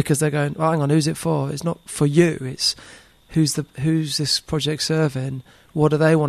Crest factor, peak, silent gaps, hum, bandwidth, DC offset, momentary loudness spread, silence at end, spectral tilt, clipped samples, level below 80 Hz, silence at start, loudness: 18 dB; -2 dBFS; none; none; 13.5 kHz; under 0.1%; 9 LU; 0 s; -5 dB/octave; under 0.1%; -50 dBFS; 0 s; -21 LUFS